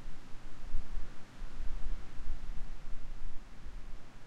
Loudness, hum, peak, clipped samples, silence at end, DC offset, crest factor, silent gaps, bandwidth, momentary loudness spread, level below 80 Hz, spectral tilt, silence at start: -49 LUFS; none; -18 dBFS; under 0.1%; 0 s; under 0.1%; 12 dB; none; 4.4 kHz; 7 LU; -38 dBFS; -5.5 dB/octave; 0 s